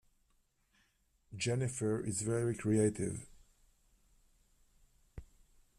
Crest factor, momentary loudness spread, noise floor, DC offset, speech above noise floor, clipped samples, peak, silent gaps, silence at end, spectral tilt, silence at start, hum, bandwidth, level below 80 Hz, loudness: 20 dB; 23 LU; -75 dBFS; under 0.1%; 41 dB; under 0.1%; -20 dBFS; none; 0.55 s; -5.5 dB/octave; 1.3 s; none; 13.5 kHz; -62 dBFS; -35 LUFS